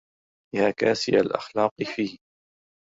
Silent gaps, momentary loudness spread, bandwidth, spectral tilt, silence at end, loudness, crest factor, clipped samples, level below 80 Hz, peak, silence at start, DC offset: 1.71-1.76 s; 9 LU; 7.8 kHz; -5 dB/octave; 0.75 s; -25 LUFS; 20 dB; under 0.1%; -64 dBFS; -6 dBFS; 0.55 s; under 0.1%